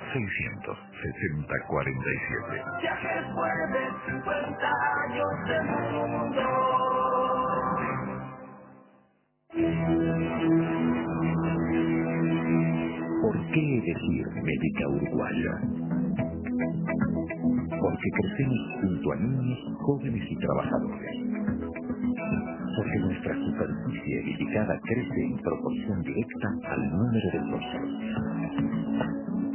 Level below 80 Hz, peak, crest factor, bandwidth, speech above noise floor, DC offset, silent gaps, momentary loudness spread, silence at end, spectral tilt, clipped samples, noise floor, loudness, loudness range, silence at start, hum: -50 dBFS; -12 dBFS; 16 dB; 3.2 kHz; 38 dB; under 0.1%; none; 6 LU; 0 s; -6.5 dB/octave; under 0.1%; -67 dBFS; -29 LUFS; 3 LU; 0 s; none